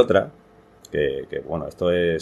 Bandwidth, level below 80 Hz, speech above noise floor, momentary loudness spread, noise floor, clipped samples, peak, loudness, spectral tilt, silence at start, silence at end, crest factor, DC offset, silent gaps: 12 kHz; -48 dBFS; 29 dB; 10 LU; -50 dBFS; under 0.1%; -2 dBFS; -24 LUFS; -6.5 dB/octave; 0 s; 0 s; 22 dB; under 0.1%; none